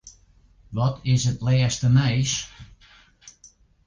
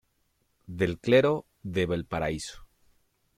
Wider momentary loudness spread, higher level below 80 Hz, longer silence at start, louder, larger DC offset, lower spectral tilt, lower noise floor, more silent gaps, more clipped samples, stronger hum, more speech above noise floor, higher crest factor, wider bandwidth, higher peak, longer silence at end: second, 9 LU vs 14 LU; first, -46 dBFS vs -54 dBFS; second, 0.05 s vs 0.7 s; first, -22 LUFS vs -28 LUFS; neither; about the same, -5 dB/octave vs -6 dB/octave; second, -56 dBFS vs -72 dBFS; neither; neither; neither; second, 35 dB vs 46 dB; about the same, 16 dB vs 20 dB; second, 9.8 kHz vs 14.5 kHz; about the same, -8 dBFS vs -10 dBFS; second, 0.55 s vs 0.75 s